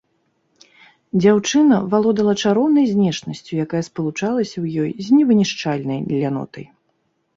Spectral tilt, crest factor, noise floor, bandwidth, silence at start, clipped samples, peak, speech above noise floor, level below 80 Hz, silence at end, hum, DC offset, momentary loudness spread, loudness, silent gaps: -6 dB/octave; 16 dB; -67 dBFS; 7.8 kHz; 1.15 s; under 0.1%; -2 dBFS; 50 dB; -60 dBFS; 0.75 s; none; under 0.1%; 10 LU; -18 LUFS; none